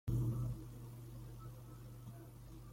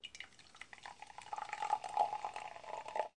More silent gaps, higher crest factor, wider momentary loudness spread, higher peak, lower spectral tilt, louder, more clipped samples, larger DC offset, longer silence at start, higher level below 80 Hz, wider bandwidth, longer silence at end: neither; about the same, 18 dB vs 22 dB; about the same, 16 LU vs 16 LU; second, -26 dBFS vs -20 dBFS; first, -8 dB/octave vs -1.5 dB/octave; second, -47 LUFS vs -42 LUFS; neither; neither; about the same, 0.05 s vs 0.05 s; first, -54 dBFS vs -80 dBFS; first, 16.5 kHz vs 11 kHz; about the same, 0 s vs 0.1 s